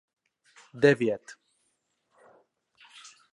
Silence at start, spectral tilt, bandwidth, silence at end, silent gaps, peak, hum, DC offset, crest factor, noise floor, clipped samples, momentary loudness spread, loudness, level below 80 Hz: 0.75 s; -6 dB/octave; 11 kHz; 2 s; none; -8 dBFS; none; under 0.1%; 24 dB; -76 dBFS; under 0.1%; 27 LU; -25 LUFS; -72 dBFS